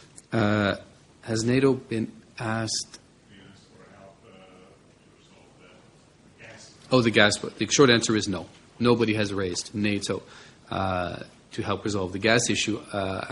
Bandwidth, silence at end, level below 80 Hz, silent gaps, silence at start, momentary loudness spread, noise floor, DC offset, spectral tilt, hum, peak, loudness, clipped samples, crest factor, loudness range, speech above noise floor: 11.5 kHz; 0 s; -58 dBFS; none; 0.3 s; 15 LU; -56 dBFS; under 0.1%; -4 dB/octave; none; -2 dBFS; -25 LUFS; under 0.1%; 26 dB; 11 LU; 31 dB